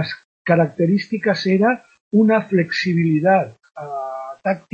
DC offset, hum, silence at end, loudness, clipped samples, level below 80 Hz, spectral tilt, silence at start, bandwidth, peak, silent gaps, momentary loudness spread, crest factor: under 0.1%; none; 0.15 s; -19 LUFS; under 0.1%; -64 dBFS; -7.5 dB/octave; 0 s; 7.2 kHz; -2 dBFS; 0.25-0.45 s, 2.01-2.11 s; 13 LU; 16 dB